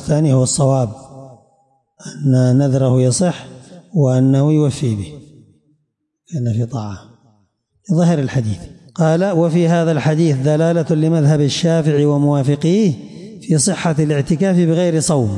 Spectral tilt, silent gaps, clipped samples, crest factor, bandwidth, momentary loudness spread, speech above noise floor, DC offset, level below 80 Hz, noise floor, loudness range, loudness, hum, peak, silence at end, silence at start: -6.5 dB/octave; none; under 0.1%; 10 dB; 11.5 kHz; 14 LU; 55 dB; under 0.1%; -50 dBFS; -70 dBFS; 6 LU; -15 LUFS; none; -4 dBFS; 0 s; 0 s